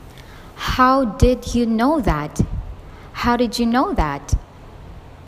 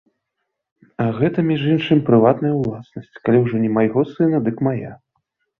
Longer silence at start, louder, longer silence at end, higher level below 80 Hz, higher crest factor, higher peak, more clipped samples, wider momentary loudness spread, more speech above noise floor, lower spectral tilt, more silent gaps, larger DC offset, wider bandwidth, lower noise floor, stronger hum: second, 0 s vs 1 s; about the same, -19 LUFS vs -18 LUFS; second, 0 s vs 0.65 s; first, -28 dBFS vs -56 dBFS; about the same, 20 dB vs 18 dB; about the same, 0 dBFS vs -2 dBFS; neither; first, 17 LU vs 13 LU; second, 22 dB vs 60 dB; second, -6 dB/octave vs -10 dB/octave; neither; neither; first, 15.5 kHz vs 5 kHz; second, -39 dBFS vs -77 dBFS; neither